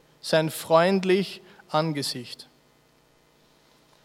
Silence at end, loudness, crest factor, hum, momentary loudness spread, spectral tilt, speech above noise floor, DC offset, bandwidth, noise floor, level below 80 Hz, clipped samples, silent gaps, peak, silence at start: 1.6 s; -24 LUFS; 22 dB; none; 19 LU; -5 dB/octave; 38 dB; under 0.1%; 16 kHz; -61 dBFS; -74 dBFS; under 0.1%; none; -6 dBFS; 0.25 s